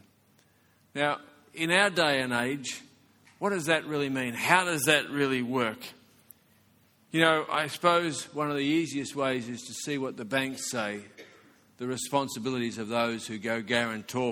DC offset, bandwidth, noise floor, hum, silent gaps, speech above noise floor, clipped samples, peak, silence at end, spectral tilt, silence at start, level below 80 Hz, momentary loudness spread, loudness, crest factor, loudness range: under 0.1%; 19 kHz; -65 dBFS; none; none; 36 dB; under 0.1%; -4 dBFS; 0 s; -3.5 dB/octave; 0.95 s; -72 dBFS; 12 LU; -28 LUFS; 26 dB; 5 LU